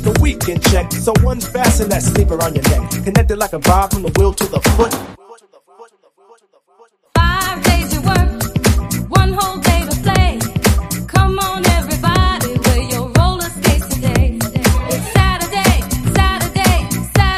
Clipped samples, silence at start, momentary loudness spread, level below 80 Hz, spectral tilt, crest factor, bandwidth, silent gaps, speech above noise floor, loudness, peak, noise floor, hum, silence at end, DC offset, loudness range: under 0.1%; 0 s; 3 LU; -20 dBFS; -5 dB/octave; 14 dB; 15.5 kHz; none; 37 dB; -15 LUFS; 0 dBFS; -50 dBFS; none; 0 s; under 0.1%; 4 LU